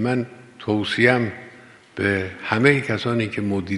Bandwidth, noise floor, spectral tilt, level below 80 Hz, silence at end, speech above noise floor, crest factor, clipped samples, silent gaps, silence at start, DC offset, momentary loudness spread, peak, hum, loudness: 11.5 kHz; -46 dBFS; -6.5 dB/octave; -58 dBFS; 0 s; 25 dB; 22 dB; under 0.1%; none; 0 s; under 0.1%; 16 LU; 0 dBFS; none; -21 LUFS